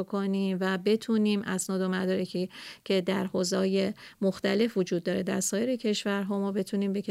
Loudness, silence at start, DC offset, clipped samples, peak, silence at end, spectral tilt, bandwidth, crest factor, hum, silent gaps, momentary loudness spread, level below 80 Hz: -29 LUFS; 0 s; under 0.1%; under 0.1%; -16 dBFS; 0 s; -5 dB/octave; 15 kHz; 14 dB; none; none; 4 LU; -70 dBFS